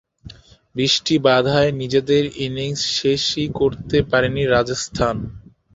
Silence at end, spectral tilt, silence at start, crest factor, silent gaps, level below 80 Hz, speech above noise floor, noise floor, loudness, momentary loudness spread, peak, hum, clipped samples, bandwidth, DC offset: 0.35 s; -4.5 dB/octave; 0.25 s; 18 dB; none; -42 dBFS; 24 dB; -42 dBFS; -19 LUFS; 8 LU; -2 dBFS; none; under 0.1%; 8 kHz; under 0.1%